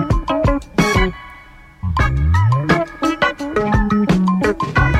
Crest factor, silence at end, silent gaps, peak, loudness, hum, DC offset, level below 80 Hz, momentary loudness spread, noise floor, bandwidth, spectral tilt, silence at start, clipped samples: 16 dB; 0 s; none; 0 dBFS; -17 LUFS; none; under 0.1%; -24 dBFS; 5 LU; -41 dBFS; 15 kHz; -6.5 dB/octave; 0 s; under 0.1%